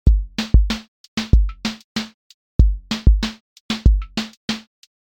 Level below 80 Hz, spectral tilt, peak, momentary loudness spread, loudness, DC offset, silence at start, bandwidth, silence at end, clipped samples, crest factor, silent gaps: -20 dBFS; -5.5 dB/octave; 0 dBFS; 10 LU; -21 LUFS; under 0.1%; 0.05 s; 8.8 kHz; 0.5 s; under 0.1%; 18 dB; 0.88-1.17 s, 1.84-1.95 s, 2.14-2.59 s, 3.40-3.69 s, 4.37-4.48 s